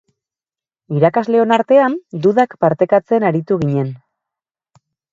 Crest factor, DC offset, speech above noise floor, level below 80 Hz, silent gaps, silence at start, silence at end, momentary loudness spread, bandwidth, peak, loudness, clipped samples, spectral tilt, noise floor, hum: 16 dB; under 0.1%; over 76 dB; -58 dBFS; none; 0.9 s; 1.15 s; 6 LU; 7.8 kHz; 0 dBFS; -15 LUFS; under 0.1%; -8.5 dB/octave; under -90 dBFS; none